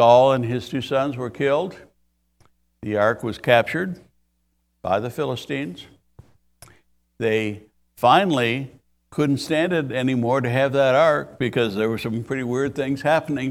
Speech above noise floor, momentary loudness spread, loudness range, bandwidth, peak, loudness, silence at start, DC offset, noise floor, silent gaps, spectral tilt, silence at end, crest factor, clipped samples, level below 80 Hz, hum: 49 dB; 12 LU; 7 LU; 15.5 kHz; 0 dBFS; -21 LUFS; 0 s; under 0.1%; -69 dBFS; none; -6 dB/octave; 0 s; 22 dB; under 0.1%; -58 dBFS; none